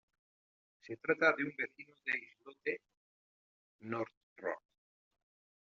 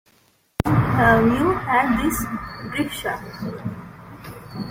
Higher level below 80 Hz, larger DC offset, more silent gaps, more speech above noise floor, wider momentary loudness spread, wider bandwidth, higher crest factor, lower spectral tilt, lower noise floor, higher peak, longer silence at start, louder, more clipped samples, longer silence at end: second, -86 dBFS vs -40 dBFS; neither; first, 2.97-3.79 s, 4.17-4.36 s vs none; first, over 52 dB vs 39 dB; second, 17 LU vs 22 LU; second, 7.2 kHz vs 16.5 kHz; first, 26 dB vs 20 dB; second, -3 dB/octave vs -6 dB/octave; first, under -90 dBFS vs -60 dBFS; second, -16 dBFS vs -2 dBFS; first, 0.85 s vs 0.6 s; second, -38 LUFS vs -21 LUFS; neither; first, 1 s vs 0 s